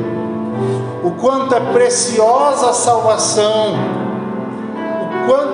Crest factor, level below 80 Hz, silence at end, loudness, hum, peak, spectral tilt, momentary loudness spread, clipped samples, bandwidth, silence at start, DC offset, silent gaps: 12 dB; -64 dBFS; 0 s; -15 LUFS; none; -2 dBFS; -4 dB/octave; 9 LU; under 0.1%; 11 kHz; 0 s; under 0.1%; none